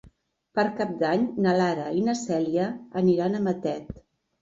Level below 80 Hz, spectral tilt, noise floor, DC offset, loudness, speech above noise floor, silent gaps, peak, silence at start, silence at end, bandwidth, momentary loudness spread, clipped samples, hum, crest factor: -58 dBFS; -6.5 dB/octave; -59 dBFS; under 0.1%; -26 LUFS; 34 dB; none; -10 dBFS; 0.55 s; 0.4 s; 7.8 kHz; 9 LU; under 0.1%; none; 16 dB